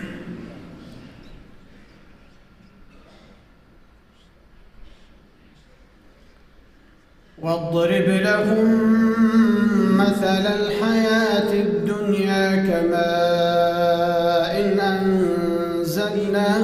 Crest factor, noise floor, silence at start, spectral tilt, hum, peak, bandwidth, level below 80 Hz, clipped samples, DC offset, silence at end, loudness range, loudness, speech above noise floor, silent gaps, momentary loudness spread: 14 dB; -52 dBFS; 0 s; -6.5 dB/octave; none; -6 dBFS; 15.5 kHz; -50 dBFS; under 0.1%; under 0.1%; 0 s; 7 LU; -19 LUFS; 34 dB; none; 8 LU